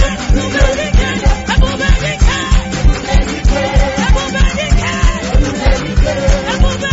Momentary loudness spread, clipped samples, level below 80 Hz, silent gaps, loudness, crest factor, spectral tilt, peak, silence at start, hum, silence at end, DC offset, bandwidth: 2 LU; under 0.1%; -14 dBFS; none; -14 LUFS; 10 dB; -5 dB/octave; 0 dBFS; 0 s; none; 0 s; under 0.1%; 8 kHz